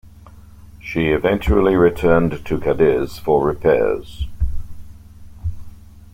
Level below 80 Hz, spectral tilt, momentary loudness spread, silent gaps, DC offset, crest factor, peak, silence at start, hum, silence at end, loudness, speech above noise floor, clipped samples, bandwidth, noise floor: -30 dBFS; -8 dB/octave; 16 LU; none; under 0.1%; 16 dB; -2 dBFS; 0.05 s; none; 0.05 s; -18 LUFS; 25 dB; under 0.1%; 16 kHz; -42 dBFS